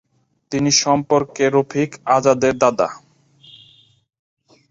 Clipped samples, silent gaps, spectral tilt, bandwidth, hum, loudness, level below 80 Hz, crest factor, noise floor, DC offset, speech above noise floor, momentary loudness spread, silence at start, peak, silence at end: under 0.1%; none; -4 dB/octave; 7.8 kHz; none; -17 LUFS; -56 dBFS; 18 dB; -52 dBFS; under 0.1%; 35 dB; 8 LU; 0.5 s; -2 dBFS; 1.75 s